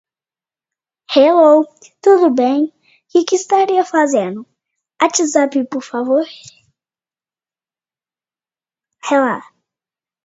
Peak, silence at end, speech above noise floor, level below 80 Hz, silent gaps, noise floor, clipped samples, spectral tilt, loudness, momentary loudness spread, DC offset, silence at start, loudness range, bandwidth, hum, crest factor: 0 dBFS; 0.85 s; over 77 dB; -70 dBFS; none; under -90 dBFS; under 0.1%; -3.5 dB/octave; -14 LUFS; 13 LU; under 0.1%; 1.1 s; 11 LU; 8 kHz; none; 16 dB